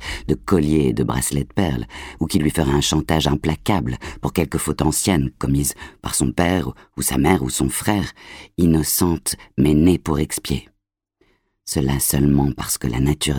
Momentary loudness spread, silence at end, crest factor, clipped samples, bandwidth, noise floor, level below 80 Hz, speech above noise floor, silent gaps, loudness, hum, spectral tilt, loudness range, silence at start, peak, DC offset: 10 LU; 0 s; 18 dB; under 0.1%; 19.5 kHz; -67 dBFS; -32 dBFS; 47 dB; none; -20 LUFS; none; -5 dB/octave; 2 LU; 0 s; -2 dBFS; under 0.1%